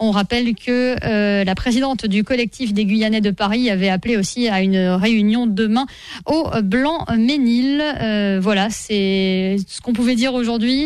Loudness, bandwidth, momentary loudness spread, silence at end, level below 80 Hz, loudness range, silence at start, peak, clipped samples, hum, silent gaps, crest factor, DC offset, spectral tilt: -18 LUFS; 12.5 kHz; 4 LU; 0 s; -42 dBFS; 1 LU; 0 s; -2 dBFS; under 0.1%; none; none; 14 dB; 0.2%; -5.5 dB/octave